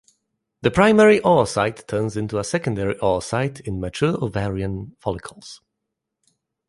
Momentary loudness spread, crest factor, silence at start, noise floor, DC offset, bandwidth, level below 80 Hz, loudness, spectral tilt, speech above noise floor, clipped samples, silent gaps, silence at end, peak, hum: 15 LU; 20 dB; 0.65 s; -81 dBFS; under 0.1%; 11.5 kHz; -46 dBFS; -20 LUFS; -6 dB/octave; 61 dB; under 0.1%; none; 1.15 s; -2 dBFS; none